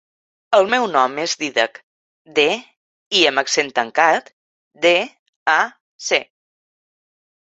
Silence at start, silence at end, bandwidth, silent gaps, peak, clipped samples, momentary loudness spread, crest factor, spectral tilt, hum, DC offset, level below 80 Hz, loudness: 0.5 s; 1.35 s; 8.2 kHz; 1.83-2.25 s, 2.77-3.11 s, 4.33-4.71 s, 5.19-5.46 s, 5.81-5.99 s; 0 dBFS; under 0.1%; 8 LU; 20 dB; -1.5 dB/octave; none; under 0.1%; -70 dBFS; -18 LUFS